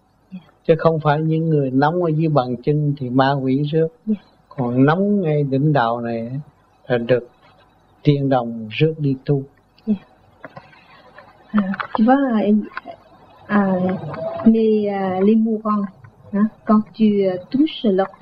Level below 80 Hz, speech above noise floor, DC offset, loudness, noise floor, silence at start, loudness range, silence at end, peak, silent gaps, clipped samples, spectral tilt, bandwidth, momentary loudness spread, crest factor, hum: -58 dBFS; 36 dB; under 0.1%; -19 LUFS; -53 dBFS; 0.3 s; 4 LU; 0.1 s; 0 dBFS; none; under 0.1%; -10.5 dB/octave; 5.2 kHz; 10 LU; 18 dB; none